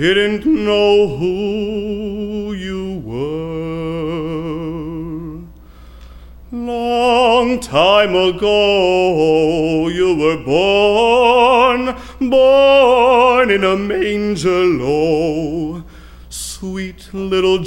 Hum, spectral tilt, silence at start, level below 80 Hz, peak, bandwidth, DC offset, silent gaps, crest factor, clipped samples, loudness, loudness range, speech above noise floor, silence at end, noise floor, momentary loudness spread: none; -5 dB/octave; 0 s; -38 dBFS; 0 dBFS; 16.5 kHz; under 0.1%; none; 14 dB; under 0.1%; -14 LUFS; 12 LU; 25 dB; 0 s; -38 dBFS; 15 LU